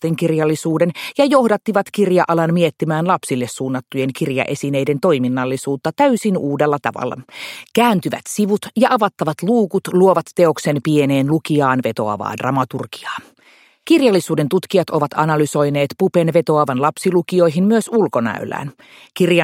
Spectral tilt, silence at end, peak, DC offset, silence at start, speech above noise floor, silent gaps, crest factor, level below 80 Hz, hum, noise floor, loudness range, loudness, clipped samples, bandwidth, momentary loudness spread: -6 dB/octave; 0 s; 0 dBFS; under 0.1%; 0 s; 34 dB; none; 16 dB; -62 dBFS; none; -51 dBFS; 3 LU; -17 LUFS; under 0.1%; 16.5 kHz; 8 LU